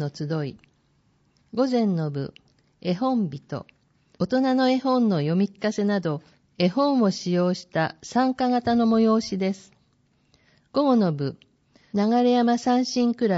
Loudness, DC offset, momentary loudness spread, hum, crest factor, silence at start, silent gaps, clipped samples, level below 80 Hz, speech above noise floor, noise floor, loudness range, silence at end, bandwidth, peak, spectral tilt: -23 LUFS; under 0.1%; 11 LU; none; 16 dB; 0 s; none; under 0.1%; -64 dBFS; 43 dB; -65 dBFS; 5 LU; 0 s; 7.6 kHz; -8 dBFS; -6 dB/octave